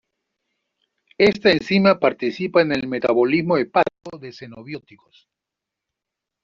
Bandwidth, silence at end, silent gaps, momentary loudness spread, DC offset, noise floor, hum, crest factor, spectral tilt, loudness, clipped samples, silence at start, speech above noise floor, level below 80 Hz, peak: 7.4 kHz; 1.65 s; none; 20 LU; under 0.1%; -85 dBFS; none; 18 dB; -4 dB/octave; -18 LUFS; under 0.1%; 1.2 s; 65 dB; -58 dBFS; -2 dBFS